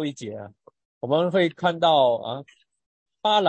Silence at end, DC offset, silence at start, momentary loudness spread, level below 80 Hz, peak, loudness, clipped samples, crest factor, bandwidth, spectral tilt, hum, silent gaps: 0 s; under 0.1%; 0 s; 18 LU; -74 dBFS; -8 dBFS; -22 LUFS; under 0.1%; 16 dB; 8.6 kHz; -5.5 dB/octave; none; 0.85-1.01 s, 2.86-3.06 s